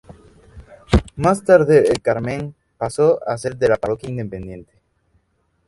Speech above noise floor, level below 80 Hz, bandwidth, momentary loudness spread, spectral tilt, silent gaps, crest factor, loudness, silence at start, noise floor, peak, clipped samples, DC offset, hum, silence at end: 48 dB; -34 dBFS; 11.5 kHz; 17 LU; -6.5 dB/octave; none; 18 dB; -18 LUFS; 0.1 s; -65 dBFS; 0 dBFS; under 0.1%; under 0.1%; none; 1.05 s